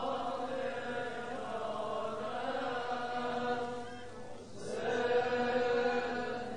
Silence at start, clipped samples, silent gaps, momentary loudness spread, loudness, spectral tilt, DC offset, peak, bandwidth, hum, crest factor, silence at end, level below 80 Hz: 0 s; under 0.1%; none; 12 LU; -36 LUFS; -4.5 dB/octave; 0.4%; -20 dBFS; 10.5 kHz; none; 16 dB; 0 s; -66 dBFS